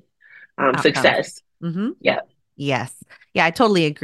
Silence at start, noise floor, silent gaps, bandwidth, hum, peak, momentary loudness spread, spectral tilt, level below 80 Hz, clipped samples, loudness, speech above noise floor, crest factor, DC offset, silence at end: 0.6 s; -49 dBFS; none; 12.5 kHz; none; 0 dBFS; 15 LU; -5 dB/octave; -64 dBFS; under 0.1%; -20 LUFS; 29 dB; 20 dB; under 0.1%; 0.1 s